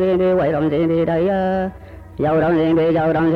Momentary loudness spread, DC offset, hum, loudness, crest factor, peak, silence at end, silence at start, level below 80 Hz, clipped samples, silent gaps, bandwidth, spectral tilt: 7 LU; under 0.1%; none; -17 LUFS; 8 dB; -8 dBFS; 0 s; 0 s; -42 dBFS; under 0.1%; none; 5.2 kHz; -9.5 dB/octave